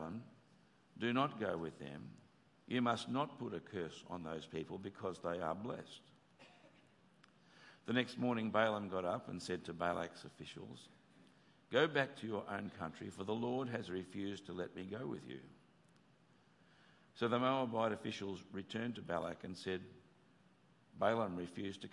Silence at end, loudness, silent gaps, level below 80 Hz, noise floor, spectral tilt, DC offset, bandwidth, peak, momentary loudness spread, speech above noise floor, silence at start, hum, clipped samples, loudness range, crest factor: 0 s; -41 LUFS; none; -82 dBFS; -70 dBFS; -6 dB/octave; under 0.1%; 11.5 kHz; -18 dBFS; 16 LU; 29 dB; 0 s; none; under 0.1%; 6 LU; 24 dB